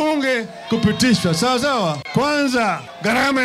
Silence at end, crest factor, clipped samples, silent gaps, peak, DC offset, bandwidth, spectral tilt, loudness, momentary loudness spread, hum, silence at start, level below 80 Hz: 0 s; 14 dB; under 0.1%; none; -4 dBFS; under 0.1%; 15.5 kHz; -4.5 dB/octave; -18 LUFS; 6 LU; none; 0 s; -48 dBFS